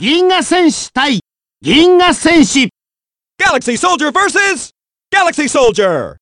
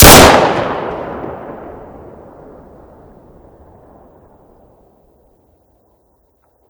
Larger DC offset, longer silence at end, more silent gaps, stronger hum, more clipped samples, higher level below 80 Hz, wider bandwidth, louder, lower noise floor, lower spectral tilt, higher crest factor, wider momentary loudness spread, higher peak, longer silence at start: neither; second, 0.1 s vs 5 s; neither; neither; second, under 0.1% vs 3%; second, -42 dBFS vs -26 dBFS; second, 11.5 kHz vs over 20 kHz; about the same, -11 LUFS vs -9 LUFS; first, under -90 dBFS vs -57 dBFS; about the same, -3 dB/octave vs -3 dB/octave; about the same, 12 dB vs 14 dB; second, 7 LU vs 31 LU; about the same, 0 dBFS vs 0 dBFS; about the same, 0 s vs 0 s